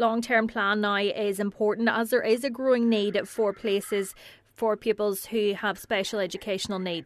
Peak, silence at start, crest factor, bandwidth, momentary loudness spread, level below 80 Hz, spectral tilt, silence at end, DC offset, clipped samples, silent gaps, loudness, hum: -10 dBFS; 0 s; 16 dB; 14 kHz; 7 LU; -64 dBFS; -4 dB/octave; 0 s; under 0.1%; under 0.1%; none; -26 LUFS; none